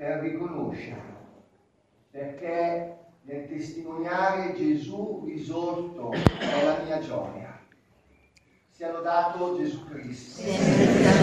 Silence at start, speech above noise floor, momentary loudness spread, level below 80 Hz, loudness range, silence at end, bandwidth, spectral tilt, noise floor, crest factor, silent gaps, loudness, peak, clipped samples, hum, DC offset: 0 s; 39 dB; 16 LU; -50 dBFS; 7 LU; 0 s; 12.5 kHz; -6 dB/octave; -65 dBFS; 28 dB; none; -27 LUFS; 0 dBFS; under 0.1%; none; under 0.1%